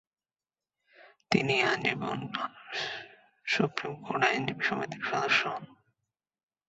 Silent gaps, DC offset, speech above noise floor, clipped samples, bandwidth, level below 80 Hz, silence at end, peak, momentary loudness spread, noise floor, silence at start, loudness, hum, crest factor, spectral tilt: none; under 0.1%; over 60 dB; under 0.1%; 8.2 kHz; -70 dBFS; 0.95 s; -8 dBFS; 11 LU; under -90 dBFS; 1 s; -30 LUFS; none; 26 dB; -4.5 dB/octave